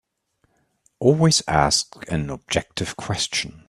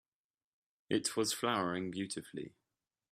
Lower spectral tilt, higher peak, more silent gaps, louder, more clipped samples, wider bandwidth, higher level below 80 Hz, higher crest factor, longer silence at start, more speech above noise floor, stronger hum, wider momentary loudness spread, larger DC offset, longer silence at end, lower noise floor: about the same, -4 dB/octave vs -3.5 dB/octave; first, 0 dBFS vs -16 dBFS; neither; first, -21 LUFS vs -36 LUFS; neither; second, 13.5 kHz vs 15.5 kHz; first, -44 dBFS vs -78 dBFS; about the same, 22 dB vs 22 dB; about the same, 1 s vs 0.9 s; second, 47 dB vs over 53 dB; neither; second, 10 LU vs 14 LU; neither; second, 0.1 s vs 0.65 s; second, -69 dBFS vs under -90 dBFS